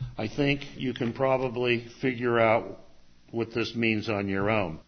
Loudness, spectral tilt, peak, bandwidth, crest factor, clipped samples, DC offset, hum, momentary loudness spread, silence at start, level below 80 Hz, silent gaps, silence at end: -27 LUFS; -7 dB/octave; -8 dBFS; 6.6 kHz; 20 dB; under 0.1%; under 0.1%; none; 9 LU; 0 s; -52 dBFS; none; 0.05 s